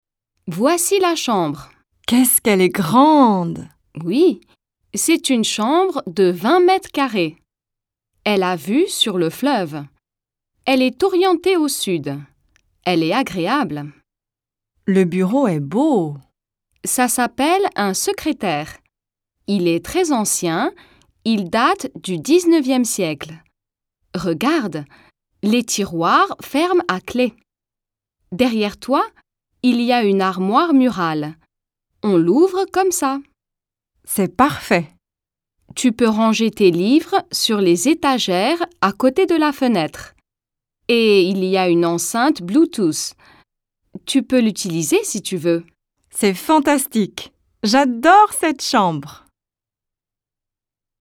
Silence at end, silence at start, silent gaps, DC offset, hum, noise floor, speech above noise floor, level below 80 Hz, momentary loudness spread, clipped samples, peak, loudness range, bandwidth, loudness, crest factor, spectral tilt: 1.9 s; 0.45 s; none; under 0.1%; none; -87 dBFS; 71 dB; -56 dBFS; 12 LU; under 0.1%; 0 dBFS; 5 LU; 18 kHz; -17 LUFS; 18 dB; -4 dB/octave